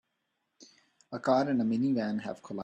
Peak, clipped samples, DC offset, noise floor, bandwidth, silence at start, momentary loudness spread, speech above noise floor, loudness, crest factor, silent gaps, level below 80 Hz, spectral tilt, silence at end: -14 dBFS; under 0.1%; under 0.1%; -81 dBFS; 8.8 kHz; 0.6 s; 11 LU; 51 dB; -30 LUFS; 18 dB; none; -74 dBFS; -7 dB/octave; 0 s